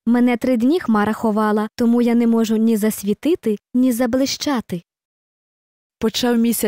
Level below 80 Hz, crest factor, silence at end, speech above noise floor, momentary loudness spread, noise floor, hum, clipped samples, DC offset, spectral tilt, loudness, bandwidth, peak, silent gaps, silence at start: -54 dBFS; 10 dB; 0 s; over 73 dB; 6 LU; under -90 dBFS; none; under 0.1%; 0.1%; -5 dB/octave; -18 LUFS; 16 kHz; -8 dBFS; 5.05-5.90 s; 0.05 s